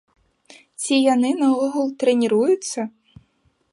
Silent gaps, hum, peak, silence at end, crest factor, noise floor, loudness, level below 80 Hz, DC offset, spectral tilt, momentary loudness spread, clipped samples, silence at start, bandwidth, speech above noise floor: none; none; -4 dBFS; 0.85 s; 16 dB; -64 dBFS; -20 LUFS; -68 dBFS; under 0.1%; -4 dB/octave; 11 LU; under 0.1%; 0.8 s; 11.5 kHz; 46 dB